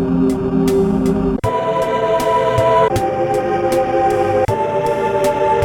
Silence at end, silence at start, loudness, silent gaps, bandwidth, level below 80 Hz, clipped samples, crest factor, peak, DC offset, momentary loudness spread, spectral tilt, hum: 0 s; 0 s; -16 LUFS; none; 18 kHz; -36 dBFS; under 0.1%; 12 dB; -2 dBFS; under 0.1%; 3 LU; -6.5 dB/octave; none